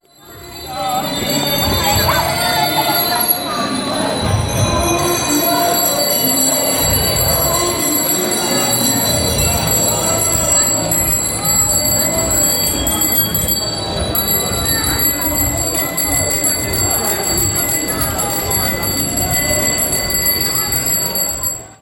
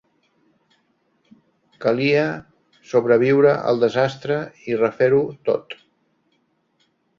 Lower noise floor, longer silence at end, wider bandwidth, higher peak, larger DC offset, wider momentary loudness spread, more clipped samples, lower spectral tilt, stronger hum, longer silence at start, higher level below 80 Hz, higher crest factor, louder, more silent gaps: second, -37 dBFS vs -67 dBFS; second, 0.05 s vs 1.45 s; first, 16.5 kHz vs 7.2 kHz; about the same, -2 dBFS vs -2 dBFS; neither; second, 5 LU vs 10 LU; neither; second, -2.5 dB/octave vs -7 dB/octave; neither; second, 0.25 s vs 1.8 s; first, -32 dBFS vs -62 dBFS; about the same, 14 dB vs 18 dB; first, -14 LUFS vs -19 LUFS; neither